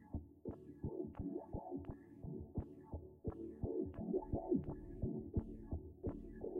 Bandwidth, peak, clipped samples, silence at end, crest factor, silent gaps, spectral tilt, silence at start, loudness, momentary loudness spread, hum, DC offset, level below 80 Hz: 3.2 kHz; -26 dBFS; under 0.1%; 0 s; 18 dB; none; -12.5 dB/octave; 0 s; -46 LUFS; 11 LU; none; under 0.1%; -54 dBFS